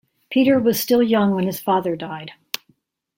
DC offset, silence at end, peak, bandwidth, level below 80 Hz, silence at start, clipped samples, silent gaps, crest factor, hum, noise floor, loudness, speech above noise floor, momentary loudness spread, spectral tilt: under 0.1%; 0.85 s; 0 dBFS; 16.5 kHz; -60 dBFS; 0.3 s; under 0.1%; none; 20 dB; none; -63 dBFS; -19 LUFS; 45 dB; 14 LU; -5.5 dB/octave